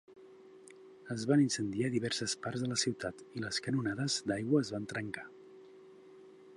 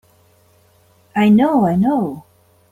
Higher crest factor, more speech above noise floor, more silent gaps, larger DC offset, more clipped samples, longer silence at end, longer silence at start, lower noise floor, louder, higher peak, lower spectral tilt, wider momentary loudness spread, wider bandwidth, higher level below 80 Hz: first, 20 dB vs 14 dB; second, 22 dB vs 40 dB; neither; neither; neither; second, 0 s vs 0.5 s; second, 0.1 s vs 1.15 s; about the same, -56 dBFS vs -54 dBFS; second, -34 LUFS vs -15 LUFS; second, -16 dBFS vs -4 dBFS; second, -4.5 dB/octave vs -8.5 dB/octave; first, 22 LU vs 13 LU; second, 11.5 kHz vs 13 kHz; second, -70 dBFS vs -56 dBFS